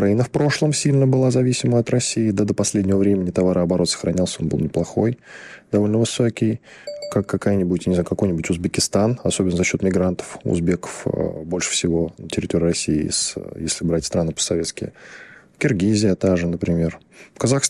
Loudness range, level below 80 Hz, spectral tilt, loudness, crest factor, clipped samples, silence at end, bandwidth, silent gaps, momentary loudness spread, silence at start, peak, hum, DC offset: 4 LU; -48 dBFS; -5 dB/octave; -20 LUFS; 16 dB; under 0.1%; 0 s; 13 kHz; none; 7 LU; 0 s; -4 dBFS; none; under 0.1%